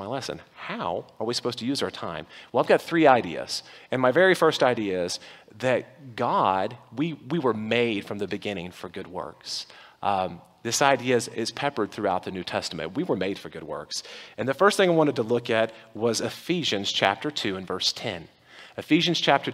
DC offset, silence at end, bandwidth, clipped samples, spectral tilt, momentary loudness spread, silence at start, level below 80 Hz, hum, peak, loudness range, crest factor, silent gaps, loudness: under 0.1%; 0 s; 16 kHz; under 0.1%; -4 dB/octave; 15 LU; 0 s; -66 dBFS; none; -2 dBFS; 6 LU; 24 dB; none; -25 LUFS